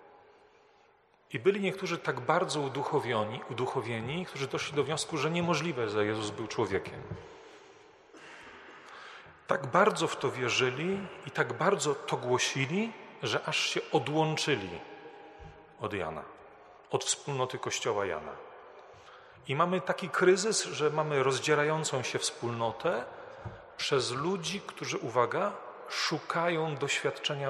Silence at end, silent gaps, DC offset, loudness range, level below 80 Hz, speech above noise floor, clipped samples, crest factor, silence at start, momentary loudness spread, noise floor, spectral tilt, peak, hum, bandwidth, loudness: 0 s; none; under 0.1%; 6 LU; -68 dBFS; 33 dB; under 0.1%; 22 dB; 0.05 s; 20 LU; -64 dBFS; -4 dB/octave; -10 dBFS; none; 13 kHz; -31 LUFS